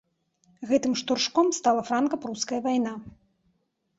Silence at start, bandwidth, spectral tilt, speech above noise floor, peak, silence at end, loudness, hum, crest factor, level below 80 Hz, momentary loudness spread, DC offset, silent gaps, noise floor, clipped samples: 0.6 s; 8 kHz; -3 dB/octave; 47 dB; -10 dBFS; 0.9 s; -26 LUFS; none; 18 dB; -66 dBFS; 9 LU; under 0.1%; none; -73 dBFS; under 0.1%